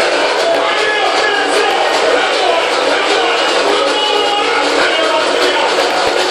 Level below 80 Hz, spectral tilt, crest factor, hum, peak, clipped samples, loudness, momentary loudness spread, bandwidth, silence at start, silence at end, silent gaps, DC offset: -52 dBFS; -1 dB/octave; 12 dB; none; 0 dBFS; under 0.1%; -12 LUFS; 1 LU; 14 kHz; 0 s; 0 s; none; under 0.1%